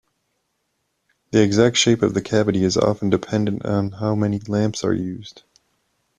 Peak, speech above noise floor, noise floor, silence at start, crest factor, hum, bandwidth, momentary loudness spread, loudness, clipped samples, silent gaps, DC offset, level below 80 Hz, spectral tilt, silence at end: -4 dBFS; 53 dB; -72 dBFS; 1.35 s; 18 dB; none; 10 kHz; 8 LU; -20 LUFS; under 0.1%; none; under 0.1%; -54 dBFS; -5 dB/octave; 0.8 s